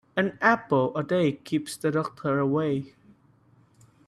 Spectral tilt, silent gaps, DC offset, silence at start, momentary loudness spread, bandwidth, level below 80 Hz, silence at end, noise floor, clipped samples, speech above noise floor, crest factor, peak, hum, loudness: -6.5 dB/octave; none; under 0.1%; 0.15 s; 8 LU; 14 kHz; -66 dBFS; 1.2 s; -60 dBFS; under 0.1%; 35 dB; 20 dB; -6 dBFS; none; -26 LUFS